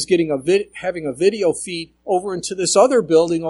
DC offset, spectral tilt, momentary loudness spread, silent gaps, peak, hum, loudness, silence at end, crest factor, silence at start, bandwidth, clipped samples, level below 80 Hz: under 0.1%; -4 dB/octave; 11 LU; none; -2 dBFS; none; -18 LUFS; 0 s; 16 dB; 0 s; 11.5 kHz; under 0.1%; -56 dBFS